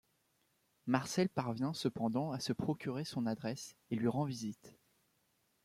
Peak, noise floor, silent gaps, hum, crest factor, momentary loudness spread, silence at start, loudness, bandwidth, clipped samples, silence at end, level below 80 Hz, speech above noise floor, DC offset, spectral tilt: -18 dBFS; -78 dBFS; none; none; 20 dB; 9 LU; 0.85 s; -38 LUFS; 15.5 kHz; under 0.1%; 0.95 s; -72 dBFS; 40 dB; under 0.1%; -6 dB/octave